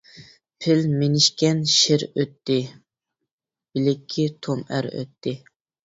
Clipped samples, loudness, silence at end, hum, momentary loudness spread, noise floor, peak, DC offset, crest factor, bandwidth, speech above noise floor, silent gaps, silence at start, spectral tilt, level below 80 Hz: under 0.1%; -22 LUFS; 0.5 s; none; 14 LU; -87 dBFS; -2 dBFS; under 0.1%; 20 dB; 7.8 kHz; 65 dB; 3.32-3.38 s; 0.15 s; -4.5 dB/octave; -64 dBFS